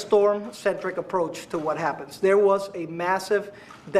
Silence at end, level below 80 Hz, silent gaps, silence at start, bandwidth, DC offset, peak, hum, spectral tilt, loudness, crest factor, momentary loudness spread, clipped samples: 0 s; -66 dBFS; none; 0 s; 14 kHz; under 0.1%; -8 dBFS; none; -5 dB/octave; -25 LUFS; 16 dB; 10 LU; under 0.1%